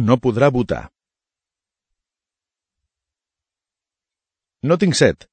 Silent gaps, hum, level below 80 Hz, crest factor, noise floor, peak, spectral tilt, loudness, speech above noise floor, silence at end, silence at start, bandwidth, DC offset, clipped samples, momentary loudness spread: none; none; -48 dBFS; 22 dB; -90 dBFS; 0 dBFS; -5.5 dB/octave; -17 LUFS; 73 dB; 0.15 s; 0 s; 9.2 kHz; under 0.1%; under 0.1%; 11 LU